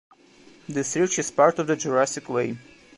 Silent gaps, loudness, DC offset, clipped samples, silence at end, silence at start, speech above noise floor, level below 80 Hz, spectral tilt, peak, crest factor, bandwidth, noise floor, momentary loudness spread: none; -24 LUFS; under 0.1%; under 0.1%; 0.4 s; 0.7 s; 29 dB; -68 dBFS; -4 dB/octave; -4 dBFS; 20 dB; 11.5 kHz; -53 dBFS; 12 LU